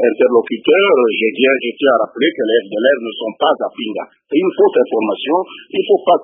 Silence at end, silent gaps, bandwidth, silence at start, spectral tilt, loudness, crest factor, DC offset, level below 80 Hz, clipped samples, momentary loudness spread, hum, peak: 0 s; none; 3.8 kHz; 0 s; -9.5 dB/octave; -15 LUFS; 14 dB; under 0.1%; -68 dBFS; under 0.1%; 9 LU; none; 0 dBFS